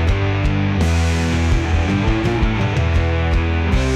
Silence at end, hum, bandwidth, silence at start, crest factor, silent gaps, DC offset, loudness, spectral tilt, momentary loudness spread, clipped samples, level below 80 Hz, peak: 0 s; none; 10 kHz; 0 s; 10 dB; none; under 0.1%; -18 LUFS; -6.5 dB/octave; 1 LU; under 0.1%; -22 dBFS; -6 dBFS